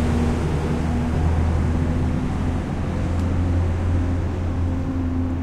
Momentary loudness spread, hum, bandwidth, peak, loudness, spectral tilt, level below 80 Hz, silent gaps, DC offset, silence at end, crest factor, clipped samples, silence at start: 3 LU; none; 9.8 kHz; -8 dBFS; -23 LUFS; -8 dB/octave; -26 dBFS; none; under 0.1%; 0 s; 12 dB; under 0.1%; 0 s